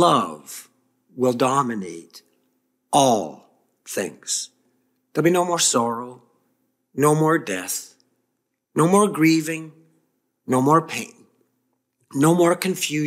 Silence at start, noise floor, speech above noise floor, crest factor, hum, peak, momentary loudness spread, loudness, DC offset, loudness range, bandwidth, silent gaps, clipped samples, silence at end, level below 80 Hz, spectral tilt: 0 s; -75 dBFS; 56 dB; 20 dB; none; -2 dBFS; 19 LU; -21 LUFS; under 0.1%; 3 LU; 16 kHz; none; under 0.1%; 0 s; -70 dBFS; -4.5 dB/octave